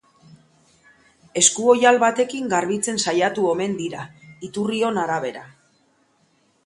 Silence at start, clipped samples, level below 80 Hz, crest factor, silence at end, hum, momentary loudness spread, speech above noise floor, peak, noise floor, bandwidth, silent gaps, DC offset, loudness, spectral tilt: 1.35 s; under 0.1%; -64 dBFS; 22 dB; 1.15 s; none; 17 LU; 43 dB; 0 dBFS; -63 dBFS; 11.5 kHz; none; under 0.1%; -20 LUFS; -2.5 dB/octave